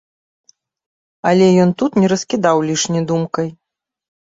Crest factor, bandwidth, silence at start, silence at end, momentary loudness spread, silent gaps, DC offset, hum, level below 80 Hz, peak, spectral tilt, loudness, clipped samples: 16 dB; 7.8 kHz; 1.25 s; 0.75 s; 10 LU; none; under 0.1%; none; -56 dBFS; -2 dBFS; -5.5 dB/octave; -16 LUFS; under 0.1%